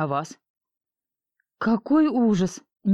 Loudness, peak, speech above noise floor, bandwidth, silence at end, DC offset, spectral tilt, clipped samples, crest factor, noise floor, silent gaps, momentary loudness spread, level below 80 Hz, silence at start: -23 LUFS; -10 dBFS; 68 dB; 10.5 kHz; 0 s; under 0.1%; -7 dB/octave; under 0.1%; 14 dB; -90 dBFS; 0.50-0.55 s; 10 LU; -58 dBFS; 0 s